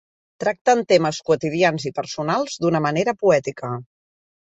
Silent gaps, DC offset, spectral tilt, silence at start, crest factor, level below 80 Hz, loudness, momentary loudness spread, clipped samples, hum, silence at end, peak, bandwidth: 0.61-0.65 s; under 0.1%; -5 dB/octave; 0.4 s; 18 dB; -62 dBFS; -21 LUFS; 10 LU; under 0.1%; none; 0.75 s; -4 dBFS; 8.2 kHz